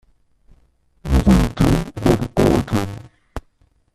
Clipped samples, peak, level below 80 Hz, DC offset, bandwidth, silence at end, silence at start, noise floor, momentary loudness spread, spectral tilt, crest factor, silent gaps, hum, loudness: under 0.1%; -2 dBFS; -26 dBFS; under 0.1%; 14.5 kHz; 0.55 s; 1.05 s; -59 dBFS; 22 LU; -7 dB/octave; 18 dB; none; none; -18 LUFS